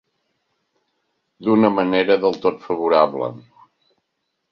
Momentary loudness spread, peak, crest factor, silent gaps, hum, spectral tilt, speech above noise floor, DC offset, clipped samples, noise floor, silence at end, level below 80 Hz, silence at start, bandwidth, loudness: 10 LU; -2 dBFS; 20 dB; none; none; -7.5 dB/octave; 57 dB; under 0.1%; under 0.1%; -75 dBFS; 1.15 s; -64 dBFS; 1.4 s; 6.4 kHz; -18 LUFS